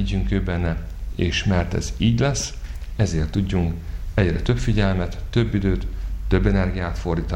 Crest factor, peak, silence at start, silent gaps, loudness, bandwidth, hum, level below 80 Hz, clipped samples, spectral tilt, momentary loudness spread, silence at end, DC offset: 16 dB; -4 dBFS; 0 s; none; -23 LUFS; 12 kHz; none; -28 dBFS; under 0.1%; -6 dB/octave; 10 LU; 0 s; under 0.1%